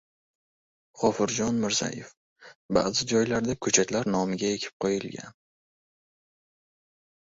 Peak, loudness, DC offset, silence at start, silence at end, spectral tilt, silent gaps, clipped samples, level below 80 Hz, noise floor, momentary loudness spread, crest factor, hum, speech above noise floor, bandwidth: -6 dBFS; -26 LUFS; under 0.1%; 0.95 s; 2.05 s; -3.5 dB/octave; 2.17-2.36 s, 2.55-2.69 s, 4.73-4.80 s; under 0.1%; -58 dBFS; under -90 dBFS; 10 LU; 24 dB; none; over 63 dB; 8 kHz